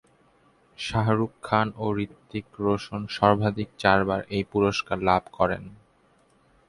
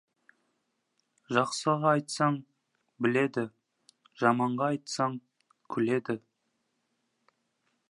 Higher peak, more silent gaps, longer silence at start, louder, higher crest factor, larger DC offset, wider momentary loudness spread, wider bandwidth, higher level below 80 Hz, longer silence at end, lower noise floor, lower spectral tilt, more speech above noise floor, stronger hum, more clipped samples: first, -4 dBFS vs -8 dBFS; neither; second, 0.8 s vs 1.3 s; first, -25 LUFS vs -30 LUFS; about the same, 22 dB vs 24 dB; neither; about the same, 11 LU vs 11 LU; about the same, 11.5 kHz vs 11.5 kHz; first, -50 dBFS vs -80 dBFS; second, 0.95 s vs 1.75 s; second, -62 dBFS vs -78 dBFS; about the same, -6.5 dB/octave vs -5.5 dB/octave; second, 37 dB vs 50 dB; neither; neither